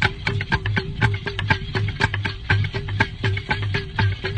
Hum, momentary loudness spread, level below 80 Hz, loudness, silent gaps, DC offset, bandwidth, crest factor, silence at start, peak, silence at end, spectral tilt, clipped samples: none; 4 LU; -36 dBFS; -23 LUFS; none; under 0.1%; 9.2 kHz; 20 dB; 0 s; -2 dBFS; 0 s; -6 dB/octave; under 0.1%